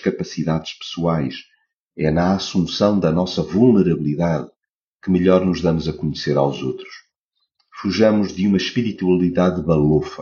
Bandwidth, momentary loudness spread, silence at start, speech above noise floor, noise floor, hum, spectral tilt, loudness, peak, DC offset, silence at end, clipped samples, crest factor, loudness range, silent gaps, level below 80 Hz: 7.2 kHz; 11 LU; 0 s; 56 dB; -74 dBFS; none; -6.5 dB/octave; -19 LUFS; -2 dBFS; under 0.1%; 0 s; under 0.1%; 18 dB; 3 LU; 1.74-1.86 s, 4.56-4.60 s, 4.69-5.00 s, 7.16-7.31 s; -44 dBFS